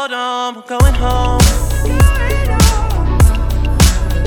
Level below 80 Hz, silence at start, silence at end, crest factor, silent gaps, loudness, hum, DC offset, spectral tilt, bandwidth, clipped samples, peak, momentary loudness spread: -14 dBFS; 0 s; 0 s; 12 dB; none; -14 LUFS; none; under 0.1%; -5 dB/octave; 18 kHz; 0.1%; 0 dBFS; 6 LU